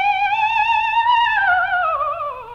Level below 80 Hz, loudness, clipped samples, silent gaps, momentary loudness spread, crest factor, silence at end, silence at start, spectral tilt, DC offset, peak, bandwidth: -52 dBFS; -17 LUFS; under 0.1%; none; 6 LU; 12 dB; 0 s; 0 s; -1.5 dB/octave; under 0.1%; -6 dBFS; 7.4 kHz